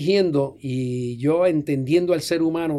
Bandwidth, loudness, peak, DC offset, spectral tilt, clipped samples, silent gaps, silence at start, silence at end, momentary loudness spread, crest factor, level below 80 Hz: 14 kHz; -22 LUFS; -8 dBFS; under 0.1%; -6.5 dB/octave; under 0.1%; none; 0 s; 0 s; 7 LU; 14 dB; -60 dBFS